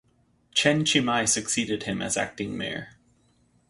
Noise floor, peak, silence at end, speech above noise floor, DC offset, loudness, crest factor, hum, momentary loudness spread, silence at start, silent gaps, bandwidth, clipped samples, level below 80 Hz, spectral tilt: -64 dBFS; -6 dBFS; 0.8 s; 38 dB; under 0.1%; -25 LUFS; 22 dB; none; 10 LU; 0.55 s; none; 11.5 kHz; under 0.1%; -58 dBFS; -2.5 dB/octave